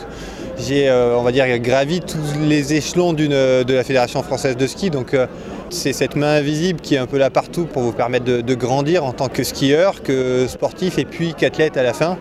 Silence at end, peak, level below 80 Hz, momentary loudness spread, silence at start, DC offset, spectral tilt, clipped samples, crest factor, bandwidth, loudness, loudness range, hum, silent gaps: 0 s; -2 dBFS; -44 dBFS; 7 LU; 0 s; under 0.1%; -5.5 dB/octave; under 0.1%; 14 dB; 15.5 kHz; -18 LUFS; 2 LU; none; none